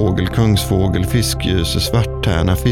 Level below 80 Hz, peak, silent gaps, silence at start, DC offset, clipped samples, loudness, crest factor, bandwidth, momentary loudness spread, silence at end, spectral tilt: -26 dBFS; -2 dBFS; none; 0 s; under 0.1%; under 0.1%; -16 LUFS; 12 dB; 17 kHz; 2 LU; 0 s; -5.5 dB/octave